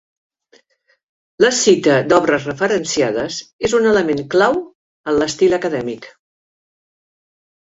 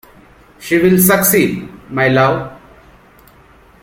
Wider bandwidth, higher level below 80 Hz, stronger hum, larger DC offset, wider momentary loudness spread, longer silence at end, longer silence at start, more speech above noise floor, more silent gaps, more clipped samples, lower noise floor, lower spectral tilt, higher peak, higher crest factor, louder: second, 8 kHz vs 16.5 kHz; second, -52 dBFS vs -46 dBFS; neither; neither; second, 11 LU vs 17 LU; first, 1.55 s vs 1.3 s; first, 1.4 s vs 0.6 s; first, 41 dB vs 32 dB; first, 3.53-3.59 s, 4.75-5.04 s vs none; neither; first, -57 dBFS vs -45 dBFS; about the same, -4 dB/octave vs -5 dB/octave; about the same, -2 dBFS vs 0 dBFS; about the same, 16 dB vs 16 dB; second, -16 LUFS vs -13 LUFS